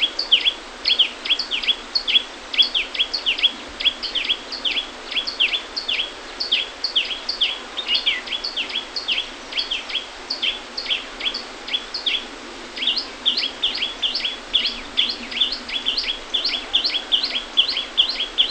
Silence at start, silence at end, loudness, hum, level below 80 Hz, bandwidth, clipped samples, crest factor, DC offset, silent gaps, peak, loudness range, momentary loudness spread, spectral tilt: 0 s; 0 s; -20 LUFS; none; -50 dBFS; 9 kHz; under 0.1%; 20 dB; under 0.1%; none; -4 dBFS; 5 LU; 7 LU; 0 dB/octave